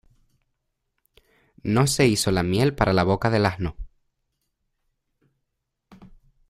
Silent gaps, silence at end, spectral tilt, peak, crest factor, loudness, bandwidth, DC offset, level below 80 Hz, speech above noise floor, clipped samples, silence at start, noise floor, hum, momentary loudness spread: none; 2.6 s; -5 dB/octave; -4 dBFS; 22 dB; -22 LUFS; 15.5 kHz; under 0.1%; -44 dBFS; 58 dB; under 0.1%; 1.65 s; -79 dBFS; none; 10 LU